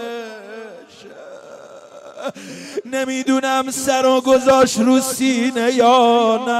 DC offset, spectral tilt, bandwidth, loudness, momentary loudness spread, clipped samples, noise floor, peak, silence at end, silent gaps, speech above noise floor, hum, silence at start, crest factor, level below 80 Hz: under 0.1%; -3 dB/octave; 16 kHz; -15 LUFS; 22 LU; under 0.1%; -39 dBFS; -2 dBFS; 0 s; none; 23 dB; none; 0 s; 16 dB; -58 dBFS